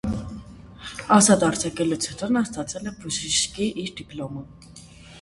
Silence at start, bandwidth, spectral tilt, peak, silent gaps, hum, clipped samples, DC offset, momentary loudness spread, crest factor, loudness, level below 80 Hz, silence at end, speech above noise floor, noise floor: 0.05 s; 11.5 kHz; -3.5 dB/octave; -2 dBFS; none; none; under 0.1%; under 0.1%; 21 LU; 22 dB; -23 LUFS; -48 dBFS; 0 s; 22 dB; -45 dBFS